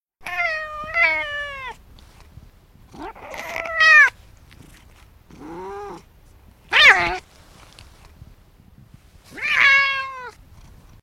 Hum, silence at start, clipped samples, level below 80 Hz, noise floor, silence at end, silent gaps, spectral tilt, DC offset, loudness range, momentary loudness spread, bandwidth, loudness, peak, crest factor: none; 0.2 s; under 0.1%; -48 dBFS; -50 dBFS; 0.75 s; none; -1.5 dB/octave; under 0.1%; 6 LU; 26 LU; 16.5 kHz; -16 LUFS; 0 dBFS; 22 dB